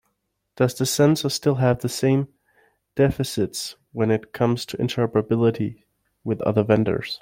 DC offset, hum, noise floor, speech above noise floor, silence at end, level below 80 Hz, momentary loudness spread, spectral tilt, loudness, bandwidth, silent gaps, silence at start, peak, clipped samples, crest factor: under 0.1%; none; -75 dBFS; 53 dB; 0.05 s; -52 dBFS; 10 LU; -6 dB/octave; -22 LUFS; 16.5 kHz; none; 0.6 s; -4 dBFS; under 0.1%; 18 dB